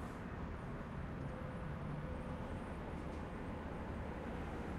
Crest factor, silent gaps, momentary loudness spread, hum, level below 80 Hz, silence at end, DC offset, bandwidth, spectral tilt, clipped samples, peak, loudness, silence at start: 12 dB; none; 2 LU; none; -52 dBFS; 0 s; under 0.1%; 13 kHz; -7.5 dB/octave; under 0.1%; -32 dBFS; -46 LUFS; 0 s